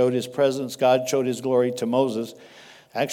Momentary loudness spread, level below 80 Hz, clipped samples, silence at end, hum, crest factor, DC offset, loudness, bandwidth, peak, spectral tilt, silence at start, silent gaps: 9 LU; -76 dBFS; under 0.1%; 0 s; none; 16 dB; under 0.1%; -23 LUFS; 17.5 kHz; -8 dBFS; -5 dB/octave; 0 s; none